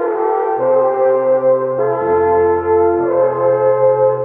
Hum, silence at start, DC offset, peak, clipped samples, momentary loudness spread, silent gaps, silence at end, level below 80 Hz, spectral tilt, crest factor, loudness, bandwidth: none; 0 s; under 0.1%; -4 dBFS; under 0.1%; 3 LU; none; 0 s; -50 dBFS; -11.5 dB/octave; 10 dB; -14 LUFS; 2.9 kHz